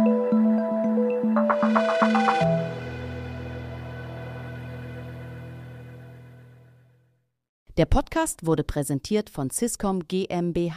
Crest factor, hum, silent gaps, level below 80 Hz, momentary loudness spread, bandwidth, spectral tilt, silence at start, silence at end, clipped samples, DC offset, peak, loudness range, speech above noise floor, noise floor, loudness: 20 dB; none; 7.49-7.66 s; -40 dBFS; 18 LU; 15.5 kHz; -6 dB/octave; 0 s; 0 s; under 0.1%; under 0.1%; -6 dBFS; 16 LU; 43 dB; -68 dBFS; -24 LUFS